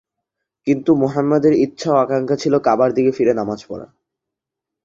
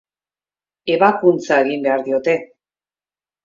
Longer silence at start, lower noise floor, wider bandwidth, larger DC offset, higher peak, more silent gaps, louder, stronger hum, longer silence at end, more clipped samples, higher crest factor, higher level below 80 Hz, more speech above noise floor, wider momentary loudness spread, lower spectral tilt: second, 0.65 s vs 0.85 s; second, -84 dBFS vs under -90 dBFS; about the same, 7.6 kHz vs 7.6 kHz; neither; about the same, -2 dBFS vs 0 dBFS; neither; about the same, -17 LUFS vs -17 LUFS; second, none vs 50 Hz at -55 dBFS; about the same, 1 s vs 1 s; neither; about the same, 16 dB vs 18 dB; first, -58 dBFS vs -68 dBFS; second, 68 dB vs over 74 dB; first, 12 LU vs 8 LU; about the same, -7 dB/octave vs -6 dB/octave